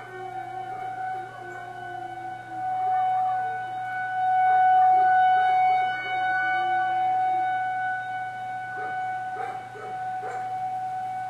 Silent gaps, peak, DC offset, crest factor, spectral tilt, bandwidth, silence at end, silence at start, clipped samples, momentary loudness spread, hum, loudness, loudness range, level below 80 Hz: none; -12 dBFS; under 0.1%; 12 dB; -4.5 dB/octave; 8.4 kHz; 0 s; 0 s; under 0.1%; 16 LU; none; -25 LUFS; 9 LU; -74 dBFS